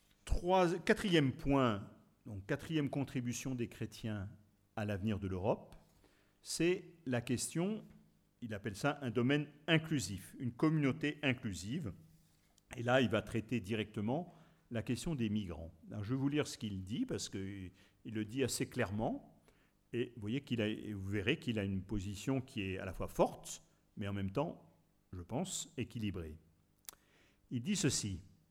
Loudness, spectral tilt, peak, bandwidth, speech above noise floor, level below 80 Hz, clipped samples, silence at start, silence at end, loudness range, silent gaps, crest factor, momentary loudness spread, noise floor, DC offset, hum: -38 LUFS; -5 dB/octave; -16 dBFS; 17 kHz; 33 dB; -56 dBFS; under 0.1%; 0.25 s; 0.2 s; 5 LU; none; 22 dB; 15 LU; -71 dBFS; under 0.1%; none